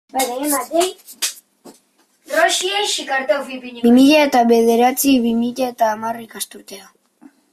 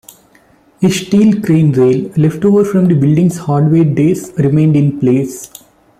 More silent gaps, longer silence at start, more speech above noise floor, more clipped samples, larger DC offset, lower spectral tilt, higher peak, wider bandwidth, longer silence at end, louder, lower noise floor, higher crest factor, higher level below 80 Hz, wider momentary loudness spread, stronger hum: neither; second, 0.15 s vs 0.8 s; first, 42 dB vs 38 dB; neither; neither; second, -2.5 dB/octave vs -7.5 dB/octave; about the same, -2 dBFS vs -2 dBFS; about the same, 16 kHz vs 15 kHz; first, 0.7 s vs 0.55 s; second, -16 LUFS vs -12 LUFS; first, -59 dBFS vs -48 dBFS; first, 16 dB vs 10 dB; second, -60 dBFS vs -48 dBFS; first, 15 LU vs 5 LU; neither